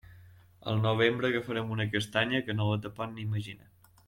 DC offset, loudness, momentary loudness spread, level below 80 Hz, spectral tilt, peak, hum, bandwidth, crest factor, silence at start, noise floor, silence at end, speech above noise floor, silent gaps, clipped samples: under 0.1%; -30 LUFS; 12 LU; -64 dBFS; -6 dB/octave; -12 dBFS; none; 13 kHz; 20 dB; 0.1 s; -55 dBFS; 0.5 s; 25 dB; none; under 0.1%